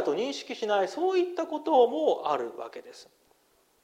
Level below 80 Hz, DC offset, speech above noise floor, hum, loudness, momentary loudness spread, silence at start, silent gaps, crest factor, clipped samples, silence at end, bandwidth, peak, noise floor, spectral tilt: -80 dBFS; under 0.1%; 39 dB; none; -27 LUFS; 15 LU; 0 s; none; 18 dB; under 0.1%; 0.8 s; 11.5 kHz; -10 dBFS; -67 dBFS; -4 dB/octave